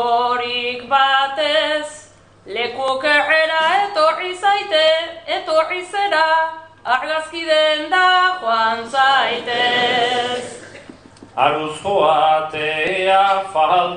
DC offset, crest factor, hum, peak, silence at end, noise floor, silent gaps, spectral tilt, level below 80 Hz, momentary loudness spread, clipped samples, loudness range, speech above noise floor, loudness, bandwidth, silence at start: under 0.1%; 16 dB; none; -2 dBFS; 0 s; -44 dBFS; none; -2.5 dB/octave; -60 dBFS; 9 LU; under 0.1%; 2 LU; 27 dB; -17 LUFS; 10 kHz; 0 s